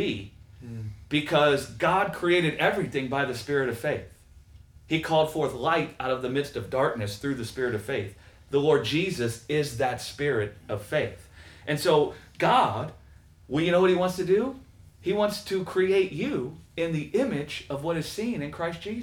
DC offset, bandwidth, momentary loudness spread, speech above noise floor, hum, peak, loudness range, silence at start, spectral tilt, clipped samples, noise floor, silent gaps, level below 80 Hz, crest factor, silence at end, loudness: under 0.1%; 19 kHz; 12 LU; 26 dB; none; -10 dBFS; 3 LU; 0 s; -5.5 dB/octave; under 0.1%; -52 dBFS; none; -56 dBFS; 18 dB; 0 s; -27 LUFS